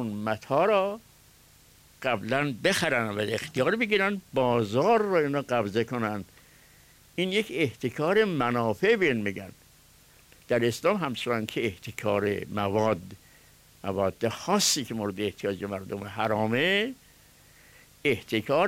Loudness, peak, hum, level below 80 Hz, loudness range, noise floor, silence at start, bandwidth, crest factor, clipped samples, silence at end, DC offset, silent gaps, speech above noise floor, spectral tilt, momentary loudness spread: -27 LUFS; -12 dBFS; 50 Hz at -55 dBFS; -62 dBFS; 4 LU; -57 dBFS; 0 s; 16 kHz; 16 dB; under 0.1%; 0 s; under 0.1%; none; 30 dB; -4.5 dB/octave; 10 LU